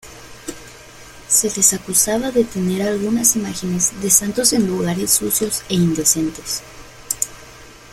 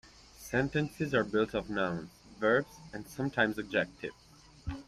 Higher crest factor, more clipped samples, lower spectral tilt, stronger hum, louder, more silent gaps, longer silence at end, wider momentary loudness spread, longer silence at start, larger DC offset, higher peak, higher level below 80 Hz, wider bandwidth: about the same, 20 dB vs 20 dB; neither; second, -3 dB/octave vs -6 dB/octave; neither; first, -17 LUFS vs -32 LUFS; neither; about the same, 0 s vs 0.05 s; second, 12 LU vs 15 LU; about the same, 0.05 s vs 0.05 s; neither; first, 0 dBFS vs -14 dBFS; first, -46 dBFS vs -56 dBFS; about the same, 16.5 kHz vs 15 kHz